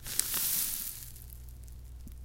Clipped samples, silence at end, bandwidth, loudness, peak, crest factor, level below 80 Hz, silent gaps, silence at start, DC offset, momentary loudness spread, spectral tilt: under 0.1%; 0 s; 17 kHz; -30 LUFS; -2 dBFS; 36 dB; -48 dBFS; none; 0 s; under 0.1%; 21 LU; -0.5 dB/octave